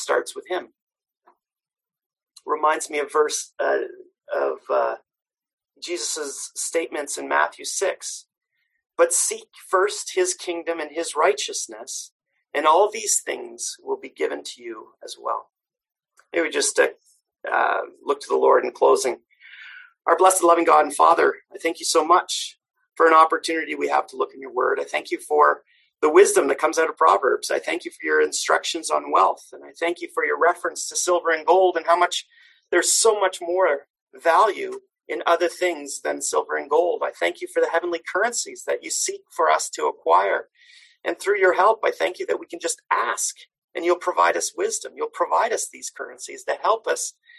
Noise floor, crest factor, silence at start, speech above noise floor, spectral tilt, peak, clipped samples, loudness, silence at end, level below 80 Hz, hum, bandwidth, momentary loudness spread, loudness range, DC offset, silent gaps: -62 dBFS; 20 dB; 0 s; 41 dB; -0.5 dB/octave; -2 dBFS; under 0.1%; -22 LUFS; 0.3 s; -76 dBFS; none; 13 kHz; 14 LU; 7 LU; under 0.1%; 0.82-0.87 s, 2.06-2.10 s, 5.53-5.57 s, 12.12-12.19 s, 33.90-33.94 s, 34.01-34.07 s, 43.58-43.68 s